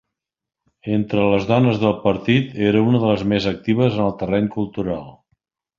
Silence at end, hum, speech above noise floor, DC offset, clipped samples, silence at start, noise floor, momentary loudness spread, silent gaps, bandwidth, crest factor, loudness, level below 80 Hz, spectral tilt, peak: 0.65 s; none; 67 dB; under 0.1%; under 0.1%; 0.85 s; -85 dBFS; 8 LU; none; 7.2 kHz; 16 dB; -19 LUFS; -48 dBFS; -8 dB/octave; -2 dBFS